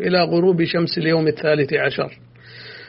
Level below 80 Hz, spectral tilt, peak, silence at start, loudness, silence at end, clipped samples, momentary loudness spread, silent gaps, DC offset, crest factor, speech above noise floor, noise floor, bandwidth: -58 dBFS; -4.5 dB/octave; -4 dBFS; 0 s; -19 LUFS; 0 s; under 0.1%; 12 LU; none; under 0.1%; 14 dB; 22 dB; -40 dBFS; 5.8 kHz